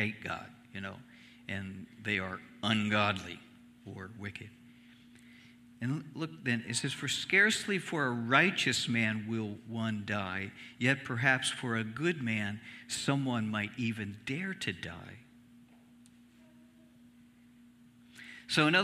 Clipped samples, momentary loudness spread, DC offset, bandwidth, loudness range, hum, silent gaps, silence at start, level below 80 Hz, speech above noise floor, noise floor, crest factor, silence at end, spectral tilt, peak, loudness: under 0.1%; 19 LU; under 0.1%; 15 kHz; 12 LU; 60 Hz at -60 dBFS; none; 0 s; -72 dBFS; 27 dB; -60 dBFS; 24 dB; 0 s; -4 dB/octave; -10 dBFS; -32 LUFS